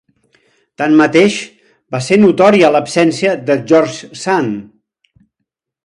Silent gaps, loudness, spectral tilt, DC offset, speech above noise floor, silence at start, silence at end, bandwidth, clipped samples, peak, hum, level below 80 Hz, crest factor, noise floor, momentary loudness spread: none; -12 LUFS; -5.5 dB/octave; under 0.1%; 63 dB; 0.8 s; 1.25 s; 11 kHz; under 0.1%; 0 dBFS; none; -58 dBFS; 14 dB; -75 dBFS; 14 LU